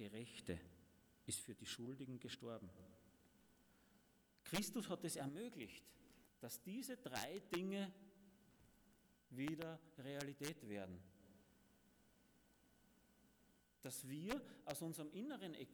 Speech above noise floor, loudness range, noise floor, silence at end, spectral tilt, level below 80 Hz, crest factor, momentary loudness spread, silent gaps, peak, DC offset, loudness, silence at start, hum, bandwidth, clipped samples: 26 dB; 6 LU; -76 dBFS; 0 s; -4 dB/octave; -78 dBFS; 24 dB; 15 LU; none; -28 dBFS; under 0.1%; -50 LUFS; 0 s; none; over 20 kHz; under 0.1%